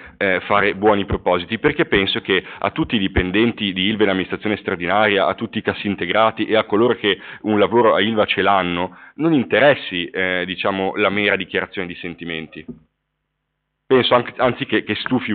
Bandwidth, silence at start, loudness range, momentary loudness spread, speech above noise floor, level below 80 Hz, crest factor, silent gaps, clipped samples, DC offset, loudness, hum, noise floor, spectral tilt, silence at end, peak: 4.7 kHz; 0 s; 5 LU; 8 LU; 56 dB; -44 dBFS; 16 dB; none; under 0.1%; under 0.1%; -18 LUFS; none; -75 dBFS; -3 dB/octave; 0 s; -2 dBFS